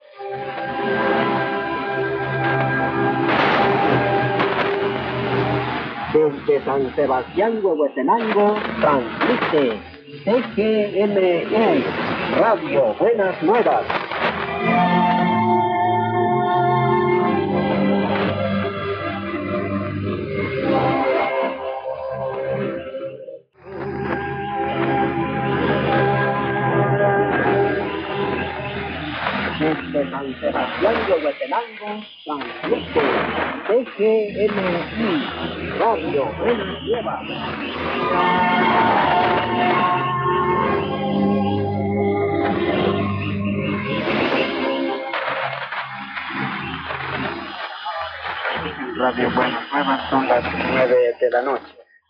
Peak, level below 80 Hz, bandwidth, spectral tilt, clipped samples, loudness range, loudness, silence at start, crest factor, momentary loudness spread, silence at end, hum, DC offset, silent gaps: -6 dBFS; -52 dBFS; 6 kHz; -8.5 dB/octave; under 0.1%; 5 LU; -20 LUFS; 0.15 s; 14 dB; 9 LU; 0.3 s; none; under 0.1%; none